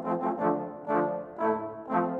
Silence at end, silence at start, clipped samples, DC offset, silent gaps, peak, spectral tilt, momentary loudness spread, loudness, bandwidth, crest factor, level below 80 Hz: 0 s; 0 s; under 0.1%; under 0.1%; none; -12 dBFS; -10 dB/octave; 4 LU; -30 LUFS; 4.7 kHz; 16 dB; -70 dBFS